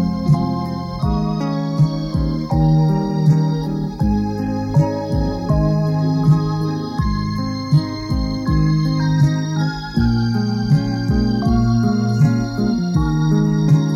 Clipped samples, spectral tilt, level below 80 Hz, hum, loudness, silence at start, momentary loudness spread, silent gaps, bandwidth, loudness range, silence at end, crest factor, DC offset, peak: under 0.1%; -8 dB/octave; -30 dBFS; none; -18 LUFS; 0 s; 6 LU; none; 7 kHz; 1 LU; 0 s; 14 dB; under 0.1%; -4 dBFS